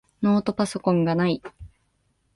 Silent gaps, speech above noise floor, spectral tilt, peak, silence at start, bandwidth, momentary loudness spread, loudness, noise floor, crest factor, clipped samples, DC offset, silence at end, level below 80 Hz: none; 47 dB; -7 dB/octave; -8 dBFS; 0.2 s; 11.5 kHz; 8 LU; -23 LUFS; -69 dBFS; 16 dB; under 0.1%; under 0.1%; 0.7 s; -54 dBFS